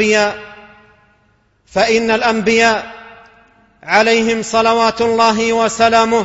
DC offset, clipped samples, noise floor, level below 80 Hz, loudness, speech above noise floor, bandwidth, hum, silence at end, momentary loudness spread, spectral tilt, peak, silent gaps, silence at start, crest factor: under 0.1%; under 0.1%; -57 dBFS; -48 dBFS; -13 LUFS; 43 dB; 8 kHz; none; 0 s; 9 LU; -3 dB/octave; 0 dBFS; none; 0 s; 14 dB